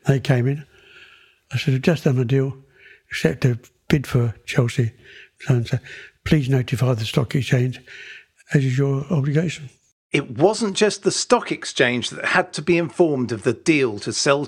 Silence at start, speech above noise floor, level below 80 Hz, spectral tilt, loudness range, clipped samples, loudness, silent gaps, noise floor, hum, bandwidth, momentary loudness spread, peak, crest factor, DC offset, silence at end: 0.05 s; 30 dB; -48 dBFS; -5.5 dB/octave; 3 LU; under 0.1%; -21 LUFS; 9.92-10.10 s; -50 dBFS; none; 14 kHz; 10 LU; -2 dBFS; 18 dB; under 0.1%; 0 s